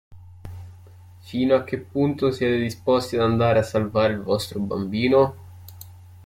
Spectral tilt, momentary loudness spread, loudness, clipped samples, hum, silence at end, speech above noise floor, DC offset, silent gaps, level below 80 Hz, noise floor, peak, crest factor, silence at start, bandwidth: -6.5 dB/octave; 22 LU; -22 LUFS; under 0.1%; none; 0.05 s; 24 dB; under 0.1%; none; -54 dBFS; -46 dBFS; -6 dBFS; 18 dB; 0.1 s; 16 kHz